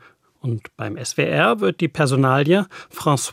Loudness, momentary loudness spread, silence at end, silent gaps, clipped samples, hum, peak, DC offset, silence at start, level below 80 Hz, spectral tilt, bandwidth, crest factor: -19 LUFS; 12 LU; 0 s; none; under 0.1%; none; -2 dBFS; under 0.1%; 0.45 s; -62 dBFS; -5.5 dB/octave; 16 kHz; 18 dB